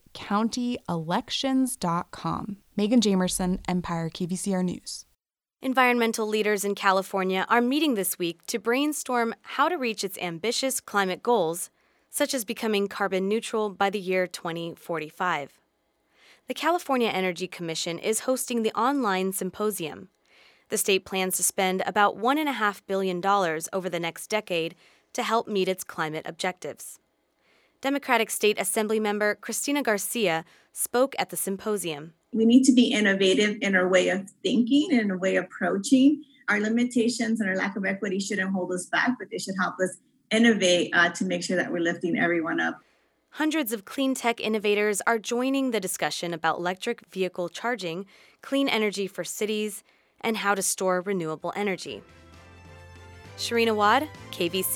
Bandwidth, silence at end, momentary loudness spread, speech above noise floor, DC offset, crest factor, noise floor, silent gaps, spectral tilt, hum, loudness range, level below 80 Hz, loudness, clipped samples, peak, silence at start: 19 kHz; 0 s; 10 LU; 50 dB; under 0.1%; 22 dB; -76 dBFS; none; -3.5 dB/octave; none; 6 LU; -62 dBFS; -26 LUFS; under 0.1%; -6 dBFS; 0.15 s